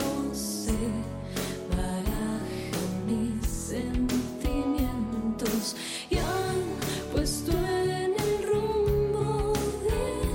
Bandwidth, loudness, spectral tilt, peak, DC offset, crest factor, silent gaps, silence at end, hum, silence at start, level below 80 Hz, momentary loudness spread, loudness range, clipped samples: 17 kHz; -29 LUFS; -5 dB/octave; -14 dBFS; under 0.1%; 14 dB; none; 0 s; none; 0 s; -38 dBFS; 5 LU; 3 LU; under 0.1%